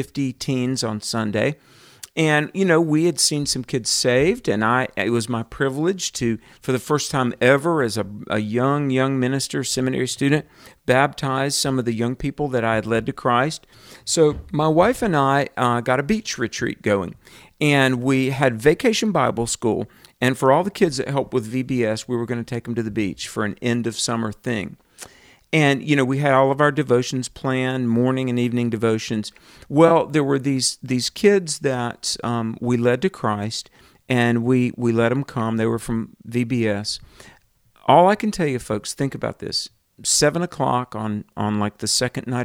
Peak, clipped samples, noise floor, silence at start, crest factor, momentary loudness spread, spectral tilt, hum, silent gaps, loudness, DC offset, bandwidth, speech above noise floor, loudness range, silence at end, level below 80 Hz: -2 dBFS; under 0.1%; -56 dBFS; 0 s; 20 dB; 9 LU; -4.5 dB/octave; none; none; -21 LUFS; under 0.1%; 16.5 kHz; 35 dB; 3 LU; 0 s; -50 dBFS